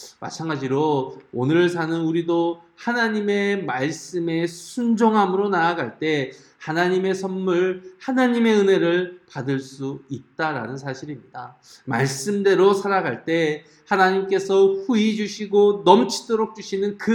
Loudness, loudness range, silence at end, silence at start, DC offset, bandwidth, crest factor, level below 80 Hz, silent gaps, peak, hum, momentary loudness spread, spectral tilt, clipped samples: -21 LUFS; 4 LU; 0 s; 0 s; under 0.1%; 12.5 kHz; 22 dB; -70 dBFS; none; 0 dBFS; none; 14 LU; -5.5 dB/octave; under 0.1%